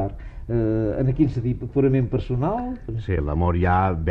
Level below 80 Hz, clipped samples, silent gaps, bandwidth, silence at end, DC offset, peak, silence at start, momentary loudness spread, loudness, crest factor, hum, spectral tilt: -34 dBFS; under 0.1%; none; 5.6 kHz; 0 s; under 0.1%; -8 dBFS; 0 s; 9 LU; -23 LUFS; 14 dB; none; -10.5 dB/octave